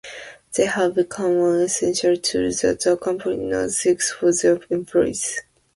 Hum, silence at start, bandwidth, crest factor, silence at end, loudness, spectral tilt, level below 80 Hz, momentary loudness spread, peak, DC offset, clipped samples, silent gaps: none; 0.05 s; 11.5 kHz; 16 dB; 0.35 s; -20 LUFS; -3.5 dB/octave; -54 dBFS; 7 LU; -6 dBFS; under 0.1%; under 0.1%; none